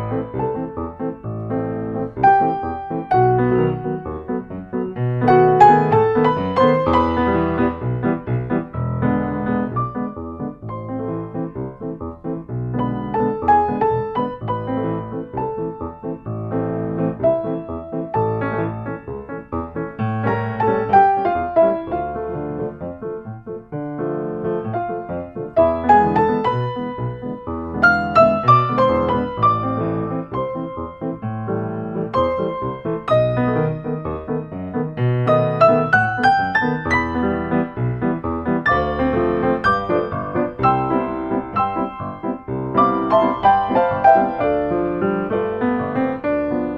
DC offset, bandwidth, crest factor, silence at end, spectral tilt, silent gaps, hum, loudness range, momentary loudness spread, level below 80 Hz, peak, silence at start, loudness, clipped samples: under 0.1%; 7.4 kHz; 18 dB; 0 s; -9 dB/octave; none; none; 7 LU; 13 LU; -42 dBFS; 0 dBFS; 0 s; -19 LUFS; under 0.1%